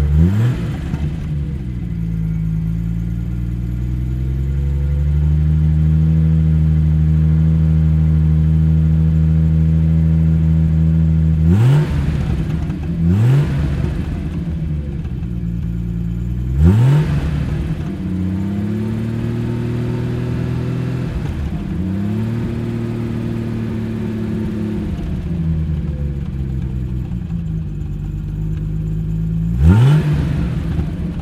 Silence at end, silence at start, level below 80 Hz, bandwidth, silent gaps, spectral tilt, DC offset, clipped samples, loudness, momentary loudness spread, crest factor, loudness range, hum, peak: 0 s; 0 s; -22 dBFS; 8 kHz; none; -9.5 dB/octave; under 0.1%; under 0.1%; -18 LUFS; 9 LU; 16 dB; 7 LU; none; 0 dBFS